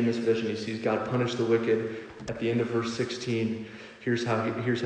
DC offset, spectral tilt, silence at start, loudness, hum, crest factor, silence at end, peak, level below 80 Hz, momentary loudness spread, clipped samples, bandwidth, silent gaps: under 0.1%; -6 dB/octave; 0 s; -29 LUFS; none; 16 dB; 0 s; -12 dBFS; -64 dBFS; 10 LU; under 0.1%; 9.8 kHz; none